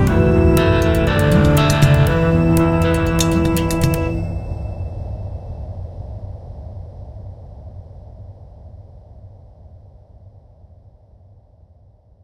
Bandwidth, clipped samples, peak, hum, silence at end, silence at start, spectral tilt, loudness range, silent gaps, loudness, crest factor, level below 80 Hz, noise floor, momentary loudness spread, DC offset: 17 kHz; under 0.1%; 0 dBFS; none; 1.95 s; 0 s; -6.5 dB/octave; 23 LU; none; -16 LUFS; 18 dB; -28 dBFS; -49 dBFS; 24 LU; under 0.1%